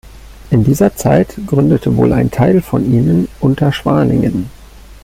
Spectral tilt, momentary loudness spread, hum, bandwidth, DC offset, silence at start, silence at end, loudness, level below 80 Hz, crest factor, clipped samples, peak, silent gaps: -7.5 dB/octave; 4 LU; none; 16 kHz; under 0.1%; 0.05 s; 0.1 s; -13 LUFS; -34 dBFS; 12 dB; under 0.1%; -2 dBFS; none